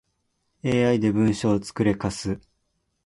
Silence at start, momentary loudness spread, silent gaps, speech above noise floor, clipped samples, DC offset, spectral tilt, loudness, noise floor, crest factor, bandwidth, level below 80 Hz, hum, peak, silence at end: 0.65 s; 11 LU; none; 51 dB; under 0.1%; under 0.1%; -6.5 dB/octave; -24 LUFS; -73 dBFS; 16 dB; 11.5 kHz; -50 dBFS; none; -8 dBFS; 0.7 s